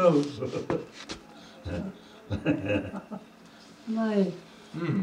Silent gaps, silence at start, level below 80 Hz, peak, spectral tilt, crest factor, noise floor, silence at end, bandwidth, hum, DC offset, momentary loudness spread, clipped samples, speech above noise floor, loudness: none; 0 s; -56 dBFS; -10 dBFS; -7 dB/octave; 20 dB; -51 dBFS; 0 s; 11 kHz; none; under 0.1%; 19 LU; under 0.1%; 23 dB; -31 LUFS